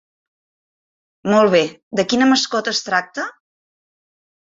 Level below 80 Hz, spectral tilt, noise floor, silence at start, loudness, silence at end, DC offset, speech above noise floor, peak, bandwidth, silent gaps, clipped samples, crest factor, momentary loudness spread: -62 dBFS; -3.5 dB/octave; under -90 dBFS; 1.25 s; -17 LUFS; 1.3 s; under 0.1%; over 73 dB; -2 dBFS; 7.8 kHz; 1.83-1.91 s; under 0.1%; 18 dB; 14 LU